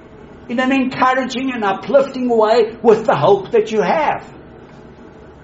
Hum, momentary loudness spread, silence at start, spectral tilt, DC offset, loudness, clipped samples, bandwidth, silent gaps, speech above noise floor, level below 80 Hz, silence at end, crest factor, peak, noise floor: none; 6 LU; 0.05 s; -4 dB/octave; under 0.1%; -16 LUFS; under 0.1%; 8 kHz; none; 24 dB; -50 dBFS; 0.1 s; 16 dB; 0 dBFS; -39 dBFS